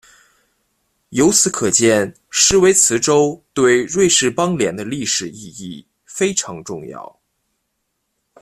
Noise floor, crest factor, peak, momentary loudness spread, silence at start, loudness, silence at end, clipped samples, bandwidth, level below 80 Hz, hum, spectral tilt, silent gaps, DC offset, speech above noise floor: -72 dBFS; 18 dB; 0 dBFS; 20 LU; 1.1 s; -15 LUFS; 1.4 s; under 0.1%; 14 kHz; -48 dBFS; none; -3 dB/octave; none; under 0.1%; 56 dB